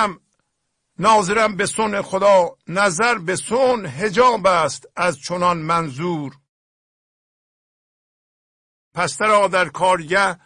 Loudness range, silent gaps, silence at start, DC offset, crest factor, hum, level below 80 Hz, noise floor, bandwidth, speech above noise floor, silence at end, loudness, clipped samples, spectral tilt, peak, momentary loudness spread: 10 LU; 6.49-8.91 s; 0 s; under 0.1%; 16 dB; none; -56 dBFS; -73 dBFS; 10.5 kHz; 55 dB; 0.1 s; -18 LUFS; under 0.1%; -4 dB/octave; -4 dBFS; 9 LU